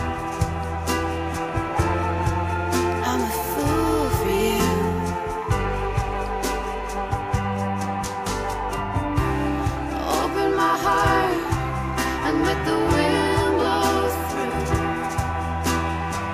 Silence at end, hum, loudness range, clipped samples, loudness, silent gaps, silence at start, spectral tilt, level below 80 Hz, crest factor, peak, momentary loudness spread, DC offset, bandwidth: 0 s; none; 5 LU; under 0.1%; -23 LUFS; none; 0 s; -5.5 dB/octave; -34 dBFS; 14 dB; -8 dBFS; 7 LU; under 0.1%; 15.5 kHz